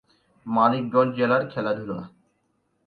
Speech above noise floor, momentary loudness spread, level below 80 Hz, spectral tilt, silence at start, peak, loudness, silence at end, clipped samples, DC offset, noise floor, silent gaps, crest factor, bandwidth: 48 dB; 14 LU; -66 dBFS; -9 dB/octave; 0.45 s; -6 dBFS; -23 LUFS; 0.8 s; under 0.1%; under 0.1%; -71 dBFS; none; 20 dB; 4.9 kHz